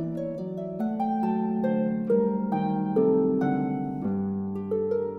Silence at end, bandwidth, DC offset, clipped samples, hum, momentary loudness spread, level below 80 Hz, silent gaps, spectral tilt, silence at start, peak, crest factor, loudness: 0 s; 4.2 kHz; under 0.1%; under 0.1%; none; 8 LU; -62 dBFS; none; -11 dB/octave; 0 s; -12 dBFS; 14 dB; -27 LUFS